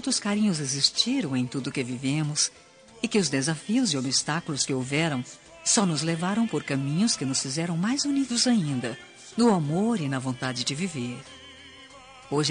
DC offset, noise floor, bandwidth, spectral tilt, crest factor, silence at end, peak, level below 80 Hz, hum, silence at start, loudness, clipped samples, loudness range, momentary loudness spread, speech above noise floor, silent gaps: under 0.1%; -48 dBFS; 10 kHz; -4 dB/octave; 20 dB; 0 s; -6 dBFS; -66 dBFS; none; 0 s; -26 LUFS; under 0.1%; 2 LU; 11 LU; 22 dB; none